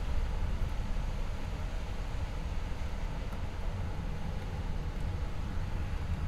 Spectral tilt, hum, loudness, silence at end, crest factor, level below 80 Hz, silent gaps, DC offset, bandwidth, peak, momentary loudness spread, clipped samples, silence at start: -6.5 dB/octave; none; -39 LUFS; 0 s; 14 dB; -36 dBFS; none; under 0.1%; 12 kHz; -20 dBFS; 3 LU; under 0.1%; 0 s